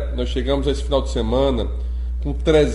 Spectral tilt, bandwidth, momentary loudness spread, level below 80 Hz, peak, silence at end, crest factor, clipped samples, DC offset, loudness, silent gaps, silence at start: -6.5 dB/octave; 11 kHz; 8 LU; -24 dBFS; -4 dBFS; 0 s; 16 dB; under 0.1%; under 0.1%; -21 LUFS; none; 0 s